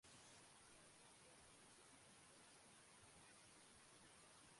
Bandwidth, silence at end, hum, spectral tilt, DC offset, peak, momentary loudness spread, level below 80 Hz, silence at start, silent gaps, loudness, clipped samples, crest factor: 11.5 kHz; 0 s; none; -2 dB/octave; under 0.1%; -52 dBFS; 1 LU; -88 dBFS; 0.05 s; none; -66 LUFS; under 0.1%; 16 dB